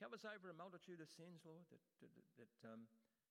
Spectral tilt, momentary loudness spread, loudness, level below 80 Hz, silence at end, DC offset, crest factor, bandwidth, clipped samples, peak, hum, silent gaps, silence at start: -5 dB/octave; 9 LU; -60 LUFS; under -90 dBFS; 0.3 s; under 0.1%; 20 dB; 15 kHz; under 0.1%; -42 dBFS; none; none; 0 s